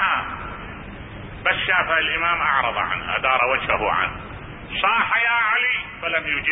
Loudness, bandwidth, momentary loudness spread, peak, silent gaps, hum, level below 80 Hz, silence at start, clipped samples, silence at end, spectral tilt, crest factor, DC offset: -20 LUFS; 3.9 kHz; 18 LU; -4 dBFS; none; none; -44 dBFS; 0 s; under 0.1%; 0 s; -8 dB/octave; 18 dB; under 0.1%